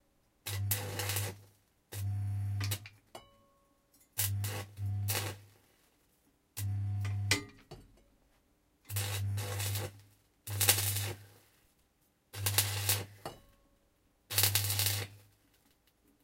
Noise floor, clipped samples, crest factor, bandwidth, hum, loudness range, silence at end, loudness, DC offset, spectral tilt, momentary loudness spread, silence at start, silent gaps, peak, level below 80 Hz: -73 dBFS; under 0.1%; 30 dB; 17 kHz; none; 7 LU; 1.05 s; -34 LUFS; under 0.1%; -2.5 dB/octave; 21 LU; 0.45 s; none; -6 dBFS; -68 dBFS